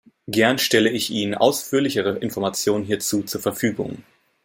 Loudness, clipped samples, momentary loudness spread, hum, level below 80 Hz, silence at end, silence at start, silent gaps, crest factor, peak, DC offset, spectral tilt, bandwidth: -21 LUFS; under 0.1%; 8 LU; none; -62 dBFS; 0.45 s; 0.3 s; none; 20 dB; -2 dBFS; under 0.1%; -3.5 dB/octave; 16.5 kHz